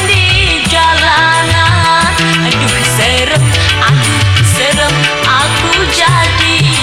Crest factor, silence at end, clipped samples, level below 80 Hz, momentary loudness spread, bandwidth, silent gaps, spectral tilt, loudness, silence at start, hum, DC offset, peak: 10 dB; 0 s; under 0.1%; -26 dBFS; 2 LU; 15.5 kHz; none; -3.5 dB/octave; -8 LUFS; 0 s; none; under 0.1%; 0 dBFS